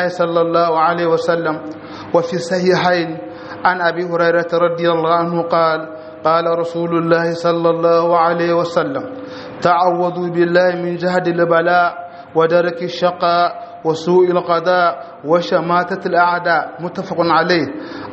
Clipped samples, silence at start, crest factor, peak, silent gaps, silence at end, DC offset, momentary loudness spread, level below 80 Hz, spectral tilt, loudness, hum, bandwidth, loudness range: under 0.1%; 0 s; 16 dB; 0 dBFS; none; 0 s; under 0.1%; 9 LU; -62 dBFS; -6.5 dB/octave; -16 LUFS; none; 8.2 kHz; 1 LU